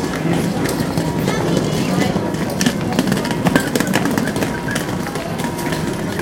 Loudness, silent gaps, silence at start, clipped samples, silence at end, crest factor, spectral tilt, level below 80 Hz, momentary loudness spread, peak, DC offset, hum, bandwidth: -19 LUFS; none; 0 s; under 0.1%; 0 s; 18 dB; -5 dB/octave; -40 dBFS; 5 LU; 0 dBFS; under 0.1%; none; 17 kHz